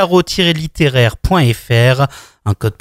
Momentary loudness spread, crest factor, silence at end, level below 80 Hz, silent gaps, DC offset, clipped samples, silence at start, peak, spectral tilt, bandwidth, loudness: 7 LU; 12 dB; 0.1 s; -30 dBFS; none; under 0.1%; under 0.1%; 0 s; 0 dBFS; -6 dB/octave; 16 kHz; -13 LUFS